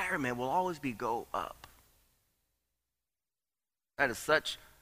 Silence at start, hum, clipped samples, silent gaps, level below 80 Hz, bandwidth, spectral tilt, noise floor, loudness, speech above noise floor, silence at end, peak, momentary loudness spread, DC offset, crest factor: 0 s; none; under 0.1%; none; -66 dBFS; 15.5 kHz; -4 dB/octave; under -90 dBFS; -34 LUFS; over 56 dB; 0.2 s; -14 dBFS; 12 LU; under 0.1%; 24 dB